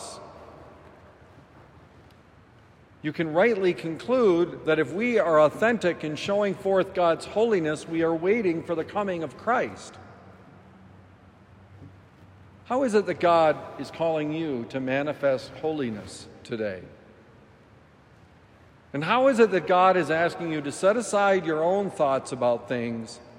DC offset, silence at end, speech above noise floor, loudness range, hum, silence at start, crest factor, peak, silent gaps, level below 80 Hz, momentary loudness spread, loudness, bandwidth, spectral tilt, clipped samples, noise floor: under 0.1%; 0 s; 30 dB; 11 LU; none; 0 s; 20 dB; -6 dBFS; none; -64 dBFS; 13 LU; -25 LUFS; 12 kHz; -5.5 dB/octave; under 0.1%; -54 dBFS